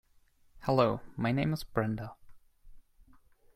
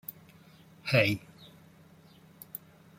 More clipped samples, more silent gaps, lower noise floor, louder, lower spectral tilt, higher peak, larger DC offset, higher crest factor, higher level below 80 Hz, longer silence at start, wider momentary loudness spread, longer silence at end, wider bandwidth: neither; neither; first, -65 dBFS vs -57 dBFS; second, -32 LUFS vs -28 LUFS; first, -7.5 dB/octave vs -5.5 dB/octave; about the same, -12 dBFS vs -10 dBFS; neither; about the same, 22 dB vs 26 dB; first, -56 dBFS vs -68 dBFS; second, 0.55 s vs 0.85 s; second, 12 LU vs 27 LU; first, 0.75 s vs 0.4 s; about the same, 15.5 kHz vs 16.5 kHz